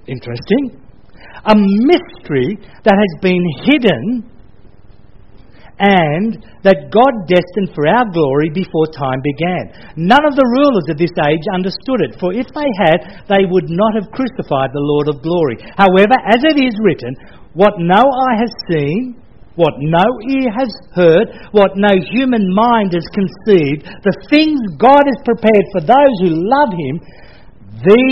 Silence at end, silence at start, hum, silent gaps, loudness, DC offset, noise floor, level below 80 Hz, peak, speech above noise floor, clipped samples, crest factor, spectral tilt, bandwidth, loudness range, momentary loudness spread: 0 s; 0.1 s; none; none; -13 LUFS; 1%; -42 dBFS; -44 dBFS; 0 dBFS; 30 dB; 0.2%; 14 dB; -8.5 dB/octave; 6.6 kHz; 3 LU; 10 LU